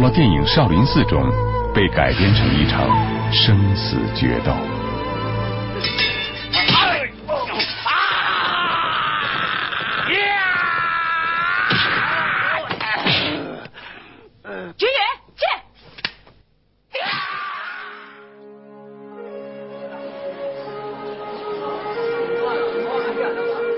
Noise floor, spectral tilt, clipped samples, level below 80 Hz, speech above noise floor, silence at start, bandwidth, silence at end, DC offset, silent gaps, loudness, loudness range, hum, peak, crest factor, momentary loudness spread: -61 dBFS; -9.5 dB/octave; under 0.1%; -34 dBFS; 45 dB; 0 s; 5.8 kHz; 0 s; under 0.1%; none; -19 LUFS; 13 LU; none; -2 dBFS; 18 dB; 16 LU